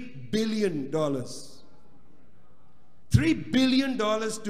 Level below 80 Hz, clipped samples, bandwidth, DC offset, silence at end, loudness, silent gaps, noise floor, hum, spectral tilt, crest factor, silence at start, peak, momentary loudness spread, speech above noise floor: -50 dBFS; under 0.1%; 15.5 kHz; 1%; 0 s; -26 LUFS; none; -62 dBFS; none; -5.5 dB/octave; 22 dB; 0 s; -6 dBFS; 9 LU; 35 dB